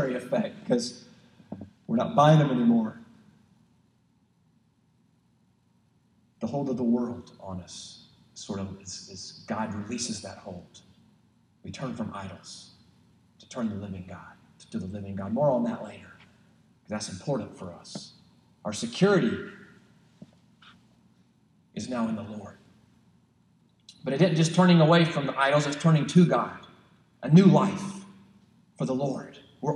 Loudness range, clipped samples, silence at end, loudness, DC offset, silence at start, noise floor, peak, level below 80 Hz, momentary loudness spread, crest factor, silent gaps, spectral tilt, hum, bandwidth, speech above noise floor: 16 LU; under 0.1%; 0 s; -26 LUFS; under 0.1%; 0 s; -67 dBFS; -6 dBFS; -70 dBFS; 23 LU; 22 dB; none; -6.5 dB/octave; none; 11 kHz; 41 dB